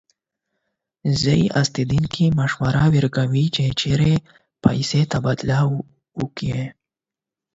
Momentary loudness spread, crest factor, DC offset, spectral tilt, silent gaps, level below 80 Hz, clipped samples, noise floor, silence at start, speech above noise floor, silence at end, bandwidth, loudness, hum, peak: 11 LU; 20 dB; under 0.1%; -6 dB/octave; none; -44 dBFS; under 0.1%; -88 dBFS; 1.05 s; 70 dB; 0.85 s; 8 kHz; -20 LUFS; none; 0 dBFS